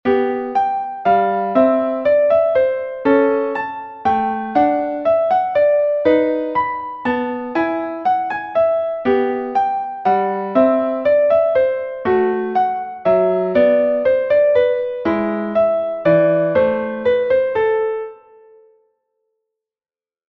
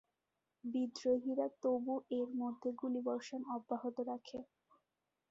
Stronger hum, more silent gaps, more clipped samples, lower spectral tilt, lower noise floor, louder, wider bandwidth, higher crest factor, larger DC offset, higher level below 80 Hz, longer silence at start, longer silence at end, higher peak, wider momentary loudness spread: neither; neither; neither; first, -8.5 dB/octave vs -4.5 dB/octave; about the same, under -90 dBFS vs -88 dBFS; first, -17 LUFS vs -40 LUFS; second, 5.8 kHz vs 7.6 kHz; about the same, 16 dB vs 16 dB; neither; first, -54 dBFS vs -82 dBFS; second, 0.05 s vs 0.65 s; first, 2.15 s vs 0.85 s; first, -2 dBFS vs -24 dBFS; about the same, 6 LU vs 8 LU